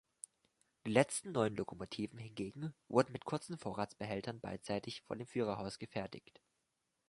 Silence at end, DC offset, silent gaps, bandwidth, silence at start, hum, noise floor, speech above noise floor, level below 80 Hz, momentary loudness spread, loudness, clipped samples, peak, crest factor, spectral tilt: 0.9 s; under 0.1%; none; 11.5 kHz; 0.85 s; none; -85 dBFS; 46 dB; -70 dBFS; 13 LU; -40 LUFS; under 0.1%; -14 dBFS; 26 dB; -5 dB/octave